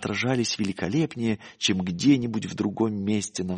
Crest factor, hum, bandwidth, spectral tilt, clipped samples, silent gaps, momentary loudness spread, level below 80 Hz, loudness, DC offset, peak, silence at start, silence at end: 18 dB; none; 10.5 kHz; -5 dB/octave; under 0.1%; none; 7 LU; -60 dBFS; -26 LUFS; under 0.1%; -8 dBFS; 0 s; 0 s